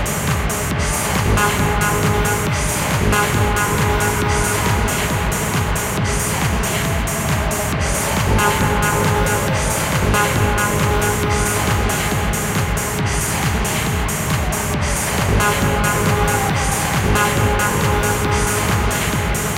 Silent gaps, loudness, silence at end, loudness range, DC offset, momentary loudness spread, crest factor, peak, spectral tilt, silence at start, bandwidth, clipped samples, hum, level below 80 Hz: none; -17 LUFS; 0 s; 2 LU; under 0.1%; 3 LU; 16 dB; -2 dBFS; -4 dB/octave; 0 s; 17 kHz; under 0.1%; none; -26 dBFS